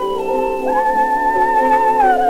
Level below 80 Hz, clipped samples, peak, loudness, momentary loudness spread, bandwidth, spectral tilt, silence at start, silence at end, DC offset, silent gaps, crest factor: -40 dBFS; under 0.1%; -4 dBFS; -15 LUFS; 6 LU; 16 kHz; -4.5 dB/octave; 0 s; 0 s; under 0.1%; none; 10 dB